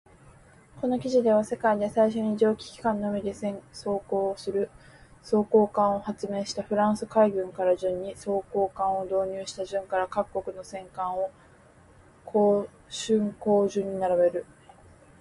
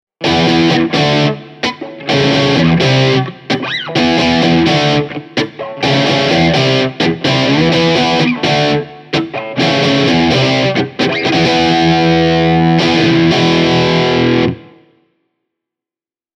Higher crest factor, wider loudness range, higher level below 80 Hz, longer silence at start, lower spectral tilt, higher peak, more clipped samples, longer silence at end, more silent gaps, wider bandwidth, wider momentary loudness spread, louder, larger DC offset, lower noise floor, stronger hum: first, 18 dB vs 12 dB; about the same, 4 LU vs 2 LU; second, -60 dBFS vs -40 dBFS; first, 0.75 s vs 0.2 s; about the same, -6 dB/octave vs -5.5 dB/octave; second, -10 dBFS vs 0 dBFS; neither; second, 0.8 s vs 1.75 s; neither; first, 11.5 kHz vs 9.4 kHz; about the same, 10 LU vs 8 LU; second, -27 LUFS vs -12 LUFS; neither; second, -55 dBFS vs under -90 dBFS; neither